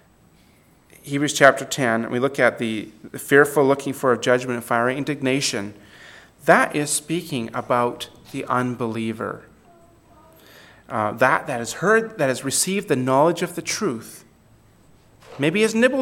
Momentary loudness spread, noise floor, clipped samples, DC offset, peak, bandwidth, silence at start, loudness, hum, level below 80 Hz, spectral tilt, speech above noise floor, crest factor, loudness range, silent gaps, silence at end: 13 LU; -55 dBFS; under 0.1%; under 0.1%; 0 dBFS; 17 kHz; 1.05 s; -21 LUFS; none; -62 dBFS; -4 dB/octave; 34 dB; 22 dB; 6 LU; none; 0 s